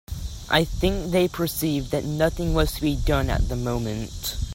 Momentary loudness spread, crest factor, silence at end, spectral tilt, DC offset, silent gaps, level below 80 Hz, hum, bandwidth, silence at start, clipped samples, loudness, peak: 7 LU; 18 dB; 0 s; -5.5 dB/octave; under 0.1%; none; -30 dBFS; none; 16.5 kHz; 0.1 s; under 0.1%; -24 LUFS; -4 dBFS